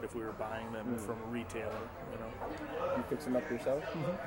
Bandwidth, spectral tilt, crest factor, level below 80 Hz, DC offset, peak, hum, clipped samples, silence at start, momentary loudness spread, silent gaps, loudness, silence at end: 16.5 kHz; -6 dB/octave; 16 dB; -58 dBFS; under 0.1%; -22 dBFS; none; under 0.1%; 0 s; 7 LU; none; -39 LUFS; 0 s